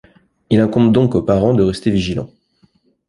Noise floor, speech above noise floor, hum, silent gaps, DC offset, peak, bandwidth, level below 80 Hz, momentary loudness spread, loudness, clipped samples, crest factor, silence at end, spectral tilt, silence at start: -57 dBFS; 43 dB; none; none; under 0.1%; 0 dBFS; 11.5 kHz; -40 dBFS; 10 LU; -15 LUFS; under 0.1%; 16 dB; 0.8 s; -8 dB/octave; 0.5 s